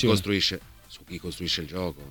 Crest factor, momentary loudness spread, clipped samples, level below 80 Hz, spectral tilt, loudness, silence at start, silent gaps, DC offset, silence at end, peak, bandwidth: 20 dB; 20 LU; under 0.1%; -50 dBFS; -4.5 dB/octave; -27 LUFS; 0 s; none; under 0.1%; 0 s; -8 dBFS; 19 kHz